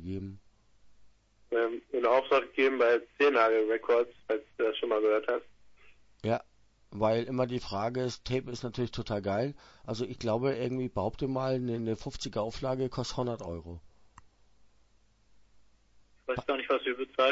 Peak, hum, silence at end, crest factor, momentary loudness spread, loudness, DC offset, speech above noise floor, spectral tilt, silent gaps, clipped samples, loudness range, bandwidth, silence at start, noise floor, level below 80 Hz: -12 dBFS; none; 0 s; 20 dB; 12 LU; -31 LUFS; under 0.1%; 34 dB; -6 dB/octave; none; under 0.1%; 10 LU; 8 kHz; 0 s; -65 dBFS; -56 dBFS